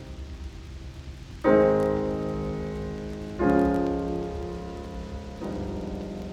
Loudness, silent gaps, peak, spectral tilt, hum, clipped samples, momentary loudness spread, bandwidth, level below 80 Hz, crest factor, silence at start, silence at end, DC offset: -27 LUFS; none; -8 dBFS; -8 dB/octave; none; under 0.1%; 19 LU; 12.5 kHz; -40 dBFS; 20 dB; 0 s; 0 s; under 0.1%